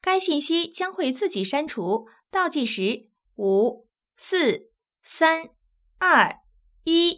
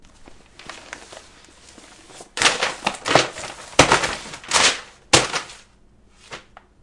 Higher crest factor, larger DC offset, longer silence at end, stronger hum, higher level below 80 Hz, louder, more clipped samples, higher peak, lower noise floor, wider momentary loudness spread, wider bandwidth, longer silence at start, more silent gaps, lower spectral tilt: about the same, 20 dB vs 24 dB; neither; second, 0 s vs 0.45 s; neither; second, -66 dBFS vs -48 dBFS; second, -24 LUFS vs -19 LUFS; neither; second, -4 dBFS vs 0 dBFS; about the same, -54 dBFS vs -53 dBFS; second, 10 LU vs 23 LU; second, 4 kHz vs 12 kHz; second, 0.05 s vs 0.2 s; neither; first, -8 dB/octave vs -1.5 dB/octave